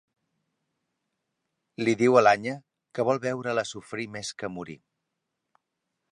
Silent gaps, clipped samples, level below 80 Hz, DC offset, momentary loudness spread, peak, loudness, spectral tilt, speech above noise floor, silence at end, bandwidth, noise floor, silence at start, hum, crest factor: none; under 0.1%; -70 dBFS; under 0.1%; 20 LU; -6 dBFS; -26 LUFS; -5 dB/octave; 57 dB; 1.35 s; 11 kHz; -82 dBFS; 1.8 s; none; 22 dB